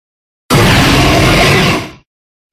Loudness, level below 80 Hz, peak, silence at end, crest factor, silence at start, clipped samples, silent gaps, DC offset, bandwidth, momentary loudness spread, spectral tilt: -8 LUFS; -22 dBFS; 0 dBFS; 0.6 s; 10 dB; 0.5 s; 0.2%; none; under 0.1%; 16 kHz; 8 LU; -4.5 dB/octave